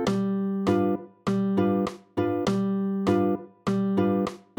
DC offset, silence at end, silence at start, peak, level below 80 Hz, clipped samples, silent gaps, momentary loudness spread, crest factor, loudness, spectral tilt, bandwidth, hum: under 0.1%; 0.2 s; 0 s; -10 dBFS; -60 dBFS; under 0.1%; none; 5 LU; 16 dB; -26 LUFS; -7.5 dB/octave; 18.5 kHz; none